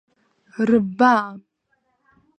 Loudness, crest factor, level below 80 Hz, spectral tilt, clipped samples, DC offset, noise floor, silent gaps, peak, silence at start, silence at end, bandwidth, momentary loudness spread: -18 LUFS; 20 dB; -62 dBFS; -7 dB/octave; under 0.1%; under 0.1%; -69 dBFS; none; -2 dBFS; 0.6 s; 1 s; 8.8 kHz; 17 LU